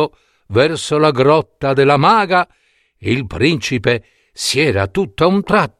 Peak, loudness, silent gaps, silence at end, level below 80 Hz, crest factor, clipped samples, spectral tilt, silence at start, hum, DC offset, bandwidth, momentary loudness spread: 0 dBFS; -15 LUFS; none; 0.1 s; -44 dBFS; 14 dB; under 0.1%; -5 dB/octave; 0 s; none; under 0.1%; 14 kHz; 9 LU